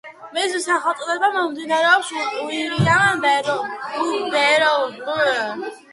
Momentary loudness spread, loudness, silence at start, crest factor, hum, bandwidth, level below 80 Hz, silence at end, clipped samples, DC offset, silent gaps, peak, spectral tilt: 9 LU; -19 LUFS; 0.05 s; 18 dB; none; 11.5 kHz; -58 dBFS; 0.15 s; under 0.1%; under 0.1%; none; -2 dBFS; -4 dB/octave